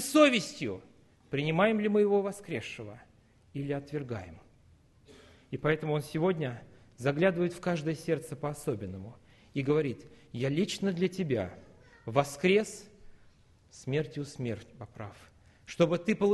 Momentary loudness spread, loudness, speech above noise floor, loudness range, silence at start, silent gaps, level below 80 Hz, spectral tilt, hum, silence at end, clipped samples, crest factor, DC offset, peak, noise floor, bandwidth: 18 LU; -31 LUFS; 31 dB; 5 LU; 0 s; none; -64 dBFS; -5.5 dB/octave; none; 0 s; under 0.1%; 22 dB; under 0.1%; -8 dBFS; -61 dBFS; 12.5 kHz